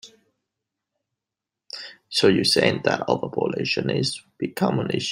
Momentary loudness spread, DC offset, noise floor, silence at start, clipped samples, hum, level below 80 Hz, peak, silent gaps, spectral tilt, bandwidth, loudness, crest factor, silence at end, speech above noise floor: 17 LU; under 0.1%; -87 dBFS; 0.05 s; under 0.1%; none; -64 dBFS; -2 dBFS; none; -4.5 dB/octave; 16 kHz; -22 LUFS; 22 dB; 0 s; 65 dB